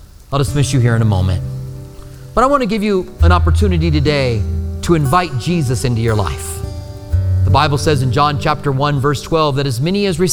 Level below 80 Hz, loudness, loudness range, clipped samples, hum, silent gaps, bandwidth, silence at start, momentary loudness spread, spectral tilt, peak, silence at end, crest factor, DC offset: -26 dBFS; -15 LUFS; 2 LU; under 0.1%; none; none; 16 kHz; 0 s; 11 LU; -6 dB/octave; 0 dBFS; 0 s; 14 dB; under 0.1%